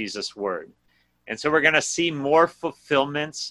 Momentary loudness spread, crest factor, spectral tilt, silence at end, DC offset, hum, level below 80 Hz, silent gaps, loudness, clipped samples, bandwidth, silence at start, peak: 12 LU; 20 dB; -3 dB/octave; 0 s; under 0.1%; none; -62 dBFS; none; -22 LUFS; under 0.1%; 12 kHz; 0 s; -4 dBFS